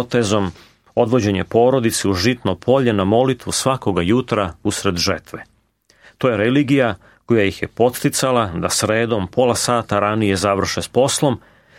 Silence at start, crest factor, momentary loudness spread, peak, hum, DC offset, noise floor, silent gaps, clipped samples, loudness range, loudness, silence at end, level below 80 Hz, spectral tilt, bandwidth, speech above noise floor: 0 s; 16 dB; 5 LU; -2 dBFS; none; under 0.1%; -58 dBFS; none; under 0.1%; 3 LU; -18 LUFS; 0.4 s; -48 dBFS; -4.5 dB/octave; 16.5 kHz; 41 dB